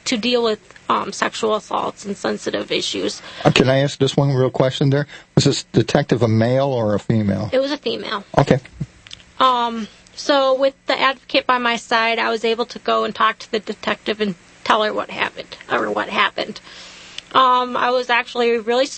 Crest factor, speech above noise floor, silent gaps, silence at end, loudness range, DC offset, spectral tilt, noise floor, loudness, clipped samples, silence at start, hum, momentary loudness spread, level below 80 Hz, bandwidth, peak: 18 dB; 23 dB; none; 0 s; 3 LU; under 0.1%; -5 dB/octave; -42 dBFS; -19 LUFS; under 0.1%; 0.05 s; none; 10 LU; -50 dBFS; 8.8 kHz; 0 dBFS